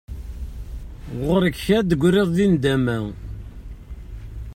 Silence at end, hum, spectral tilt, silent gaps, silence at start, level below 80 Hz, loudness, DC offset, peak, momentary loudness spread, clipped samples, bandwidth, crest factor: 0 s; none; -7 dB/octave; none; 0.1 s; -36 dBFS; -20 LUFS; under 0.1%; -6 dBFS; 21 LU; under 0.1%; 16 kHz; 16 dB